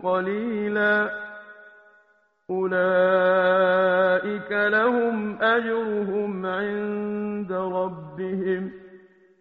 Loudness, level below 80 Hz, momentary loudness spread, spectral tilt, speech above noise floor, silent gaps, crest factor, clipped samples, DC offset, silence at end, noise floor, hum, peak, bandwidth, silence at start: -23 LUFS; -66 dBFS; 11 LU; -4 dB/octave; 40 dB; none; 16 dB; under 0.1%; under 0.1%; 0.45 s; -63 dBFS; none; -8 dBFS; 5 kHz; 0 s